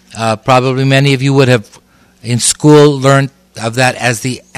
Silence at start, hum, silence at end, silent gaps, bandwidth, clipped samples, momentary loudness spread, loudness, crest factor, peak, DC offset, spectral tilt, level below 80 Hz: 0.15 s; none; 0.2 s; none; 14.5 kHz; 1%; 12 LU; -10 LUFS; 10 dB; 0 dBFS; under 0.1%; -5 dB/octave; -48 dBFS